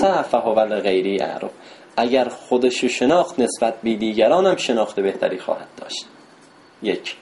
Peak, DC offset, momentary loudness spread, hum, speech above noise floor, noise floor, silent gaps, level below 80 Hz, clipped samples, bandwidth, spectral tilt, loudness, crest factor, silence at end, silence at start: -4 dBFS; under 0.1%; 11 LU; none; 29 dB; -49 dBFS; none; -60 dBFS; under 0.1%; 11.5 kHz; -4 dB/octave; -20 LUFS; 16 dB; 0.05 s; 0 s